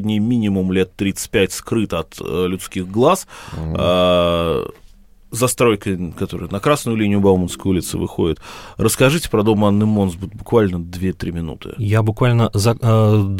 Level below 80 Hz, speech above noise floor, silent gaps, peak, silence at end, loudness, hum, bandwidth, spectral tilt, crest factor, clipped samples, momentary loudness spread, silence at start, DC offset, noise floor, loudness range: -40 dBFS; 27 dB; none; 0 dBFS; 0 s; -18 LUFS; none; 16.5 kHz; -6 dB/octave; 16 dB; under 0.1%; 10 LU; 0 s; under 0.1%; -44 dBFS; 2 LU